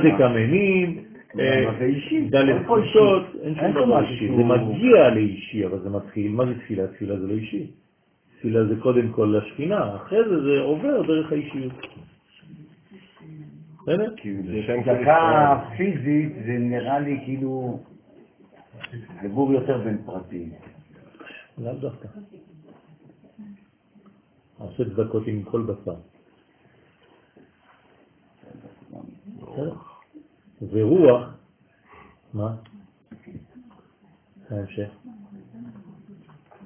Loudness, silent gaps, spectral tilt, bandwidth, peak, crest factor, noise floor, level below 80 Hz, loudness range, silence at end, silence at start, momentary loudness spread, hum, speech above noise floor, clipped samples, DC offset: -22 LUFS; none; -11 dB/octave; 3.6 kHz; -2 dBFS; 22 dB; -63 dBFS; -56 dBFS; 20 LU; 0 s; 0 s; 24 LU; none; 42 dB; under 0.1%; under 0.1%